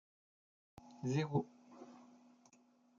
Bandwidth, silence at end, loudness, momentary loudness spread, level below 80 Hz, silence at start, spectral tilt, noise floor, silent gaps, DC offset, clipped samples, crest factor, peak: 7.4 kHz; 0.95 s; -40 LUFS; 24 LU; -80 dBFS; 0.85 s; -7 dB/octave; -70 dBFS; none; under 0.1%; under 0.1%; 22 dB; -24 dBFS